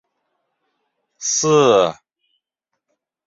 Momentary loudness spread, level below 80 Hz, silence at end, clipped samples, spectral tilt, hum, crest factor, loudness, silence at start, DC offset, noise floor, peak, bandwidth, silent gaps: 10 LU; -64 dBFS; 1.35 s; under 0.1%; -3.5 dB/octave; none; 18 dB; -16 LUFS; 1.2 s; under 0.1%; -79 dBFS; -2 dBFS; 7.8 kHz; none